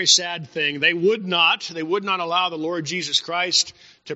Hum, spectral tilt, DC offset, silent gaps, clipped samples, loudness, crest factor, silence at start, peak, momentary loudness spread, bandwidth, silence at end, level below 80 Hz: none; -0.5 dB/octave; under 0.1%; none; under 0.1%; -20 LUFS; 20 dB; 0 s; -2 dBFS; 8 LU; 8 kHz; 0 s; -72 dBFS